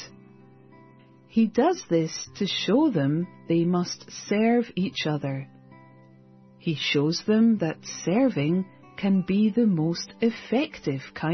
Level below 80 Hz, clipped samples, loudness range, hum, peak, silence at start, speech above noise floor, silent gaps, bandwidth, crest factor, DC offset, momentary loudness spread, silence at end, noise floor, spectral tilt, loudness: -64 dBFS; under 0.1%; 3 LU; none; -10 dBFS; 0 s; 29 dB; none; 6.4 kHz; 16 dB; under 0.1%; 10 LU; 0 s; -53 dBFS; -6 dB/octave; -25 LUFS